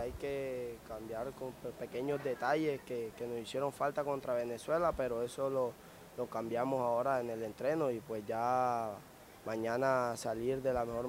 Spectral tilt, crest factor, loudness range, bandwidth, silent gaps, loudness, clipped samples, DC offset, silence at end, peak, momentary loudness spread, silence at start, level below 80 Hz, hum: -5.5 dB/octave; 18 dB; 3 LU; 16 kHz; none; -37 LUFS; under 0.1%; under 0.1%; 0 s; -18 dBFS; 11 LU; 0 s; -62 dBFS; none